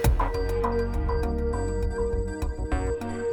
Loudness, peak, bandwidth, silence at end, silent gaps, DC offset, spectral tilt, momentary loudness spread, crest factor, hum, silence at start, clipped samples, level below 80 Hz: -28 LUFS; -10 dBFS; 19.5 kHz; 0 s; none; under 0.1%; -7 dB/octave; 4 LU; 16 dB; none; 0 s; under 0.1%; -28 dBFS